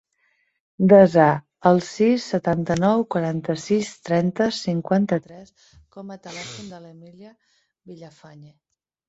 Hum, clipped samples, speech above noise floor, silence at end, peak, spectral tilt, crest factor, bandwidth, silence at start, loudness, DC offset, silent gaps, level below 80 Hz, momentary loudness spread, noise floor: none; under 0.1%; 47 dB; 1 s; -2 dBFS; -6.5 dB/octave; 20 dB; 8 kHz; 0.8 s; -20 LUFS; under 0.1%; none; -58 dBFS; 22 LU; -68 dBFS